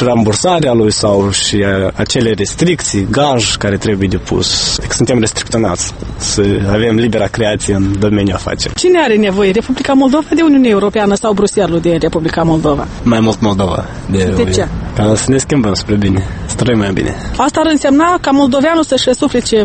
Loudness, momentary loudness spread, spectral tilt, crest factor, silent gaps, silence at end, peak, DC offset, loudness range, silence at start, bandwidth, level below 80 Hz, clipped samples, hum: -12 LUFS; 5 LU; -5 dB/octave; 12 dB; none; 0 s; 0 dBFS; under 0.1%; 2 LU; 0 s; 9 kHz; -30 dBFS; under 0.1%; none